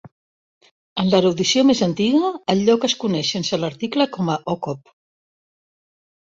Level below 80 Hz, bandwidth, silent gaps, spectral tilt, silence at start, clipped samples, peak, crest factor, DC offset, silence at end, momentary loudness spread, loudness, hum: -58 dBFS; 7.8 kHz; 0.12-0.61 s, 0.71-0.96 s; -5 dB/octave; 0.05 s; under 0.1%; -4 dBFS; 18 dB; under 0.1%; 1.5 s; 9 LU; -19 LUFS; none